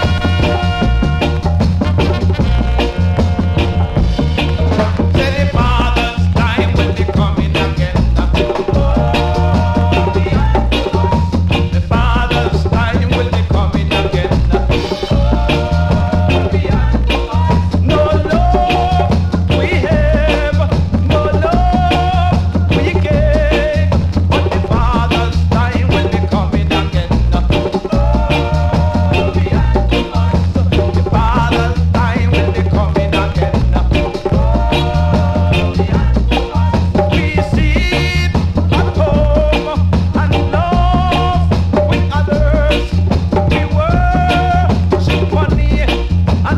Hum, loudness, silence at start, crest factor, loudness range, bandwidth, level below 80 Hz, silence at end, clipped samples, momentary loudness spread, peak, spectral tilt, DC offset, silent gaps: none; -14 LUFS; 0 s; 12 dB; 1 LU; 9 kHz; -18 dBFS; 0 s; under 0.1%; 2 LU; 0 dBFS; -7.5 dB/octave; under 0.1%; none